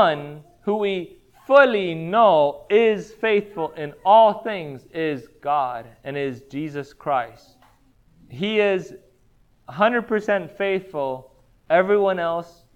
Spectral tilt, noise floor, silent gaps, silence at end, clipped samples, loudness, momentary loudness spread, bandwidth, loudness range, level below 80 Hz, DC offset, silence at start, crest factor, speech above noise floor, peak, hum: -6.5 dB/octave; -58 dBFS; none; 0.3 s; under 0.1%; -21 LUFS; 16 LU; 8.6 kHz; 8 LU; -60 dBFS; under 0.1%; 0 s; 20 dB; 38 dB; -2 dBFS; none